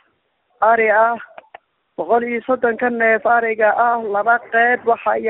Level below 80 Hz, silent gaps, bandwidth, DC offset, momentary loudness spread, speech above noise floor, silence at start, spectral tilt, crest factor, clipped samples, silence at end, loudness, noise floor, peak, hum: -62 dBFS; none; 4 kHz; under 0.1%; 5 LU; 48 dB; 0.6 s; -2.5 dB/octave; 14 dB; under 0.1%; 0 s; -16 LUFS; -65 dBFS; -2 dBFS; none